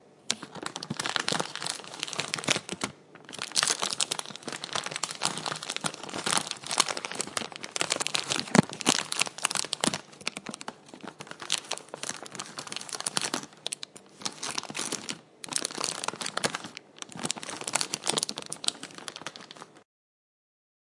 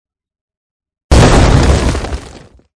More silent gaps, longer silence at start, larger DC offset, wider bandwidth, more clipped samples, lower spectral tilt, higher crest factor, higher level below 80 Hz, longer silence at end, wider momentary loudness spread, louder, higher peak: neither; second, 0.1 s vs 1.1 s; neither; about the same, 11.5 kHz vs 11 kHz; second, under 0.1% vs 2%; second, -1.5 dB/octave vs -5.5 dB/octave; first, 32 dB vs 12 dB; second, -76 dBFS vs -16 dBFS; first, 1 s vs 0.5 s; about the same, 14 LU vs 15 LU; second, -30 LUFS vs -10 LUFS; about the same, -2 dBFS vs 0 dBFS